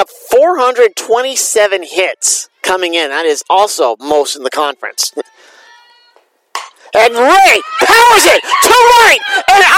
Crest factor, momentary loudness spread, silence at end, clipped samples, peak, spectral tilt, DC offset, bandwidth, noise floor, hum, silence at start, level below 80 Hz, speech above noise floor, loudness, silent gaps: 10 dB; 11 LU; 0 s; 0.6%; 0 dBFS; 0 dB/octave; under 0.1%; over 20 kHz; -51 dBFS; none; 0 s; -46 dBFS; 42 dB; -9 LUFS; none